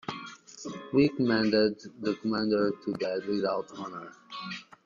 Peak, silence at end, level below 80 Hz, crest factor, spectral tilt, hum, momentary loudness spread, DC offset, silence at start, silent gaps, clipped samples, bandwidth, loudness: -12 dBFS; 0.25 s; -66 dBFS; 18 dB; -6 dB/octave; none; 17 LU; under 0.1%; 0.1 s; none; under 0.1%; 7.4 kHz; -29 LUFS